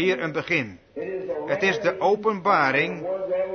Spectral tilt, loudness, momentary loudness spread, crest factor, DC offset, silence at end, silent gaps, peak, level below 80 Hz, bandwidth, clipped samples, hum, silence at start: -5.5 dB/octave; -23 LUFS; 11 LU; 18 dB; under 0.1%; 0 s; none; -6 dBFS; -64 dBFS; 6.6 kHz; under 0.1%; none; 0 s